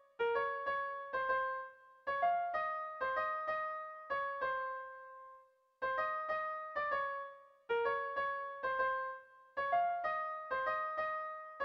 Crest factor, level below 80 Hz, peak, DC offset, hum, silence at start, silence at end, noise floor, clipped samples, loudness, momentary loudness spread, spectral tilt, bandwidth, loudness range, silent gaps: 16 dB; -74 dBFS; -22 dBFS; under 0.1%; none; 0.2 s; 0 s; -64 dBFS; under 0.1%; -38 LUFS; 11 LU; -4.5 dB/octave; 6.2 kHz; 3 LU; none